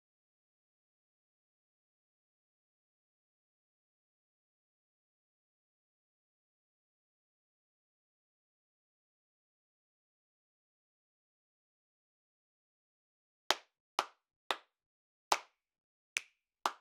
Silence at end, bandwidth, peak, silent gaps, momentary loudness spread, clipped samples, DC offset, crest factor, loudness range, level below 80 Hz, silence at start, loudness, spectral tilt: 0.05 s; 7.6 kHz; -6 dBFS; 13.80-13.98 s, 14.36-14.50 s, 14.86-15.31 s, 15.80-16.16 s; 5 LU; under 0.1%; under 0.1%; 42 dB; 5 LU; under -90 dBFS; 13.5 s; -39 LUFS; 3 dB/octave